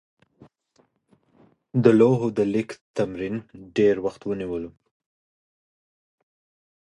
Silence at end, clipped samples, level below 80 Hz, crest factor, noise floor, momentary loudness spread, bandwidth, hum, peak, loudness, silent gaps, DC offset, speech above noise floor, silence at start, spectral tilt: 2.2 s; under 0.1%; -60 dBFS; 24 dB; -65 dBFS; 14 LU; 10.5 kHz; none; -2 dBFS; -23 LUFS; 2.81-2.94 s; under 0.1%; 43 dB; 1.75 s; -8 dB/octave